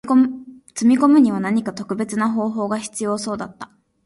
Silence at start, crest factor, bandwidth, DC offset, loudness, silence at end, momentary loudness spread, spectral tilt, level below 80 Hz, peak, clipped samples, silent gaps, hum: 0.05 s; 16 dB; 11.5 kHz; under 0.1%; -19 LUFS; 0.4 s; 19 LU; -5.5 dB/octave; -62 dBFS; -2 dBFS; under 0.1%; none; none